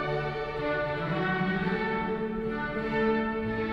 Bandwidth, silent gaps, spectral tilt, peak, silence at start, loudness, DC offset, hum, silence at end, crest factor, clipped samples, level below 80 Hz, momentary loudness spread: 7 kHz; none; -8 dB/octave; -16 dBFS; 0 s; -30 LUFS; under 0.1%; none; 0 s; 14 dB; under 0.1%; -48 dBFS; 5 LU